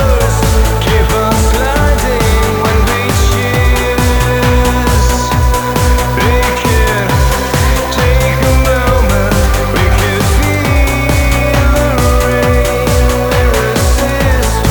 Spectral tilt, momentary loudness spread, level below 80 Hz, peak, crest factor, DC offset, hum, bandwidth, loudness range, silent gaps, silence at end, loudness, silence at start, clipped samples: -5 dB/octave; 1 LU; -14 dBFS; 0 dBFS; 10 dB; under 0.1%; none; over 20 kHz; 0 LU; none; 0 s; -11 LUFS; 0 s; under 0.1%